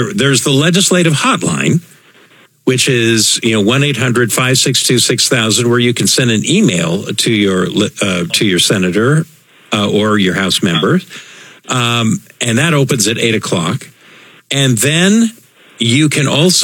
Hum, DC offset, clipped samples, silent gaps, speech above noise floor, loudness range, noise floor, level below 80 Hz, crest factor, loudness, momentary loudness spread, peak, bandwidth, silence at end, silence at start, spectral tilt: none; under 0.1%; under 0.1%; none; 33 dB; 3 LU; -45 dBFS; -58 dBFS; 12 dB; -11 LUFS; 7 LU; 0 dBFS; 19 kHz; 0 s; 0 s; -4 dB/octave